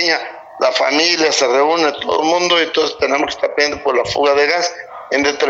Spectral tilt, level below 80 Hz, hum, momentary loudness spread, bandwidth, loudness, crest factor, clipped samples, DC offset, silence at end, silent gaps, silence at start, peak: -1.5 dB/octave; -52 dBFS; none; 6 LU; 8 kHz; -15 LUFS; 16 dB; under 0.1%; under 0.1%; 0 s; none; 0 s; 0 dBFS